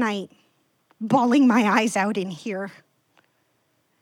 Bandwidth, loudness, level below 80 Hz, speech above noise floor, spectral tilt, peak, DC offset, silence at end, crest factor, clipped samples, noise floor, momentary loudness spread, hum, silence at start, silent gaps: 14 kHz; -21 LUFS; -76 dBFS; 47 dB; -5 dB/octave; -6 dBFS; under 0.1%; 1.3 s; 16 dB; under 0.1%; -68 dBFS; 18 LU; none; 0 s; none